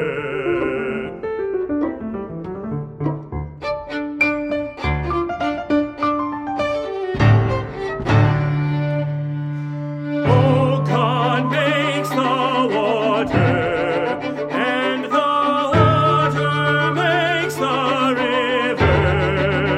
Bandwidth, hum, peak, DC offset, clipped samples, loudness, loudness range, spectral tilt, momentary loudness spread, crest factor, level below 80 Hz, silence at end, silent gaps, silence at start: 13.5 kHz; none; -2 dBFS; under 0.1%; under 0.1%; -19 LUFS; 7 LU; -7 dB/octave; 10 LU; 18 dB; -40 dBFS; 0 s; none; 0 s